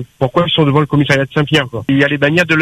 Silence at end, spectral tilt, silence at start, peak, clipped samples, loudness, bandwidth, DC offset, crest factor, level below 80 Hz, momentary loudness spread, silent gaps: 0 s; -6 dB/octave; 0 s; 0 dBFS; under 0.1%; -13 LUFS; 13 kHz; under 0.1%; 12 dB; -44 dBFS; 3 LU; none